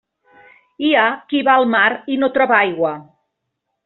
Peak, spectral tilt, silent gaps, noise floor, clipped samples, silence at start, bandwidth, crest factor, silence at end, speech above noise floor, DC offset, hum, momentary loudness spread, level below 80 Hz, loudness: -2 dBFS; -1 dB/octave; none; -76 dBFS; under 0.1%; 0.8 s; 4.2 kHz; 16 dB; 0.85 s; 60 dB; under 0.1%; none; 8 LU; -64 dBFS; -16 LUFS